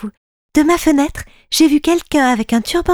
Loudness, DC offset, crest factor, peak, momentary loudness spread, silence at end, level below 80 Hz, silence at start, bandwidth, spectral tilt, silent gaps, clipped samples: -14 LUFS; under 0.1%; 12 dB; -2 dBFS; 8 LU; 0 s; -36 dBFS; 0 s; 17.5 kHz; -3.5 dB/octave; 0.17-0.49 s; under 0.1%